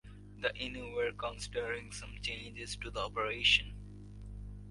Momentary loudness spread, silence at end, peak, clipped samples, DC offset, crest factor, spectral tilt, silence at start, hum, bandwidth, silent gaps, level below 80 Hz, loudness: 22 LU; 0 s; -16 dBFS; under 0.1%; under 0.1%; 22 dB; -2.5 dB/octave; 0.05 s; 50 Hz at -50 dBFS; 11.5 kHz; none; -50 dBFS; -35 LUFS